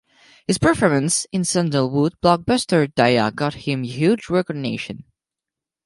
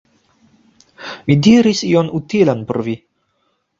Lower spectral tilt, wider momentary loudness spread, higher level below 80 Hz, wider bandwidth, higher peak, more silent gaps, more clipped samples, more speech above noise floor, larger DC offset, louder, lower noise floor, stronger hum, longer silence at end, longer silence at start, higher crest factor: about the same, -5 dB/octave vs -6 dB/octave; second, 9 LU vs 18 LU; about the same, -48 dBFS vs -52 dBFS; first, 11.5 kHz vs 7.6 kHz; about the same, 0 dBFS vs 0 dBFS; neither; neither; first, 68 dB vs 52 dB; neither; second, -19 LUFS vs -15 LUFS; first, -87 dBFS vs -66 dBFS; neither; about the same, 0.85 s vs 0.85 s; second, 0.5 s vs 1 s; about the same, 20 dB vs 16 dB